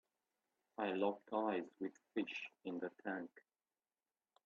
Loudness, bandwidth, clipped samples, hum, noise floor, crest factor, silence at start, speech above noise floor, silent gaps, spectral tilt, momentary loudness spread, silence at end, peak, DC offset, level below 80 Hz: -44 LUFS; 7.2 kHz; under 0.1%; none; under -90 dBFS; 20 dB; 0.8 s; over 47 dB; none; -3.5 dB/octave; 9 LU; 1.05 s; -24 dBFS; under 0.1%; -90 dBFS